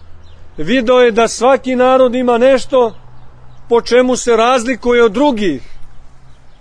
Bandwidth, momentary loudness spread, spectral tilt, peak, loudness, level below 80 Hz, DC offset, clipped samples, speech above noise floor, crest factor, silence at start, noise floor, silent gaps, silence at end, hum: 10.5 kHz; 7 LU; -4 dB/octave; 0 dBFS; -12 LUFS; -36 dBFS; under 0.1%; under 0.1%; 24 dB; 12 dB; 0 s; -35 dBFS; none; 0.1 s; none